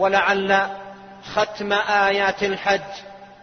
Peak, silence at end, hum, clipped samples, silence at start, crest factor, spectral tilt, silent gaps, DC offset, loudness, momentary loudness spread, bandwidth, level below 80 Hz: -2 dBFS; 0.1 s; none; under 0.1%; 0 s; 18 dB; -3.5 dB/octave; none; under 0.1%; -20 LUFS; 19 LU; 6.6 kHz; -56 dBFS